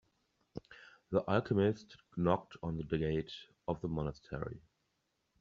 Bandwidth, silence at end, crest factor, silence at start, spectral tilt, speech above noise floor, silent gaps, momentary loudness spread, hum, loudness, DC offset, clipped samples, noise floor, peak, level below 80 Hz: 7.2 kHz; 0.85 s; 22 dB; 0.55 s; -6.5 dB/octave; 46 dB; none; 19 LU; none; -37 LUFS; under 0.1%; under 0.1%; -82 dBFS; -16 dBFS; -58 dBFS